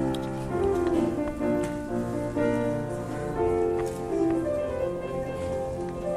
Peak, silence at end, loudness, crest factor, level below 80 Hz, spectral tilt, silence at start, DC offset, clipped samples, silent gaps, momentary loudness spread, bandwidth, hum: -14 dBFS; 0 s; -28 LUFS; 14 dB; -44 dBFS; -7.5 dB/octave; 0 s; under 0.1%; under 0.1%; none; 6 LU; 13.5 kHz; none